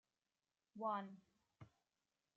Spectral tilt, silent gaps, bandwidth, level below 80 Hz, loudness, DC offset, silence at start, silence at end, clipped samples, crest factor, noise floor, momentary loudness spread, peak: -5 dB/octave; none; 7.6 kHz; under -90 dBFS; -47 LUFS; under 0.1%; 0.75 s; 0.7 s; under 0.1%; 20 dB; under -90 dBFS; 22 LU; -32 dBFS